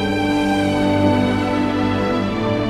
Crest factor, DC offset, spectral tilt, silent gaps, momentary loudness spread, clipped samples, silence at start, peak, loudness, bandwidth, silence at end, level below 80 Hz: 16 dB; under 0.1%; -6.5 dB/octave; none; 4 LU; under 0.1%; 0 s; -2 dBFS; -18 LUFS; 13.5 kHz; 0 s; -38 dBFS